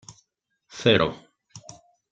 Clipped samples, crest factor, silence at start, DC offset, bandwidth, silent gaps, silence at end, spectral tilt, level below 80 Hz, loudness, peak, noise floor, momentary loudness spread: under 0.1%; 22 dB; 0.75 s; under 0.1%; 8.8 kHz; none; 0.5 s; -5 dB/octave; -58 dBFS; -22 LUFS; -6 dBFS; -74 dBFS; 25 LU